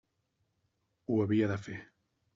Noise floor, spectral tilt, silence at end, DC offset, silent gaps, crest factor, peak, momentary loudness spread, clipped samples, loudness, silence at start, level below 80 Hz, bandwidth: -79 dBFS; -7.5 dB/octave; 0.5 s; under 0.1%; none; 18 dB; -18 dBFS; 17 LU; under 0.1%; -32 LUFS; 1.1 s; -72 dBFS; 7.4 kHz